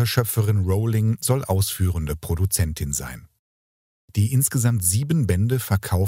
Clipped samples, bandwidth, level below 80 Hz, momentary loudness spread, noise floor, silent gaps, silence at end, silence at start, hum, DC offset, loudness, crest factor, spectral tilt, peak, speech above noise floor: under 0.1%; 16.5 kHz; -38 dBFS; 7 LU; under -90 dBFS; 3.39-4.08 s; 0 s; 0 s; none; under 0.1%; -22 LUFS; 18 dB; -5 dB/octave; -4 dBFS; over 69 dB